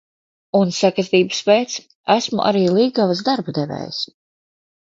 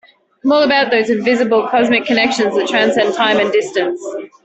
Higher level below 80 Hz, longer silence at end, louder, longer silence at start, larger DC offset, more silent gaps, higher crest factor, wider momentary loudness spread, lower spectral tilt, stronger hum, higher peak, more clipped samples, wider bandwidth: second, -64 dBFS vs -58 dBFS; first, 0.8 s vs 0.2 s; second, -18 LUFS vs -14 LUFS; about the same, 0.55 s vs 0.45 s; neither; first, 1.95-2.04 s vs none; first, 18 dB vs 12 dB; first, 10 LU vs 7 LU; about the same, -5 dB/octave vs -4 dB/octave; neither; about the same, -2 dBFS vs -2 dBFS; neither; about the same, 7.8 kHz vs 8.4 kHz